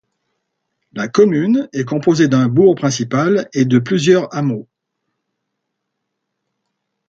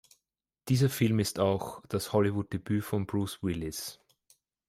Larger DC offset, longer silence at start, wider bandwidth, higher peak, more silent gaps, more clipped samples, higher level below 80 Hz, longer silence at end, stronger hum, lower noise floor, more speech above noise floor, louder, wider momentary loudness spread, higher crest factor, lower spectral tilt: neither; first, 0.95 s vs 0.65 s; second, 7.8 kHz vs 16 kHz; first, 0 dBFS vs -12 dBFS; neither; neither; about the same, -60 dBFS vs -60 dBFS; first, 2.45 s vs 0.75 s; neither; second, -75 dBFS vs -87 dBFS; first, 62 dB vs 57 dB; first, -15 LUFS vs -30 LUFS; about the same, 8 LU vs 9 LU; about the same, 16 dB vs 18 dB; about the same, -6.5 dB/octave vs -6 dB/octave